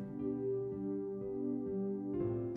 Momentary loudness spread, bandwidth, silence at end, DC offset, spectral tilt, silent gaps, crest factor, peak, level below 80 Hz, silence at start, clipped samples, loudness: 3 LU; 3 kHz; 0 s; under 0.1%; -12.5 dB/octave; none; 14 dB; -24 dBFS; -64 dBFS; 0 s; under 0.1%; -39 LUFS